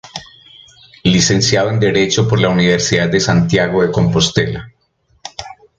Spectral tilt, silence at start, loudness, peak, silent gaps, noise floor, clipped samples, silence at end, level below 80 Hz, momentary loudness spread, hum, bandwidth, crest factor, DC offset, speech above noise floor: -4.5 dB/octave; 0.05 s; -13 LUFS; 0 dBFS; none; -59 dBFS; under 0.1%; 0.25 s; -40 dBFS; 18 LU; none; 9.2 kHz; 14 dB; under 0.1%; 45 dB